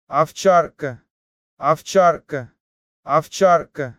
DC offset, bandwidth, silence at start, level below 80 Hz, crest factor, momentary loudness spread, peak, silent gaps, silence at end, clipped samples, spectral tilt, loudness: under 0.1%; 15.5 kHz; 0.1 s; -60 dBFS; 16 dB; 14 LU; -2 dBFS; 1.10-1.57 s, 2.60-3.03 s; 0.05 s; under 0.1%; -5 dB/octave; -18 LUFS